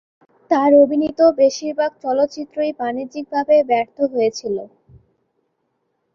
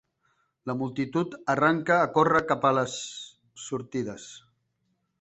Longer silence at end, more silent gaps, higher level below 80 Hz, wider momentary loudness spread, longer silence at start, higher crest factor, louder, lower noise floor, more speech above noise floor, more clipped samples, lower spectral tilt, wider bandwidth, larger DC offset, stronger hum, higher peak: first, 1.5 s vs 0.85 s; neither; first, -60 dBFS vs -66 dBFS; second, 11 LU vs 19 LU; second, 0.5 s vs 0.65 s; second, 16 dB vs 22 dB; first, -18 LUFS vs -26 LUFS; second, -70 dBFS vs -75 dBFS; first, 53 dB vs 49 dB; neither; about the same, -4.5 dB/octave vs -5 dB/octave; second, 7.2 kHz vs 8.4 kHz; neither; neither; first, -2 dBFS vs -6 dBFS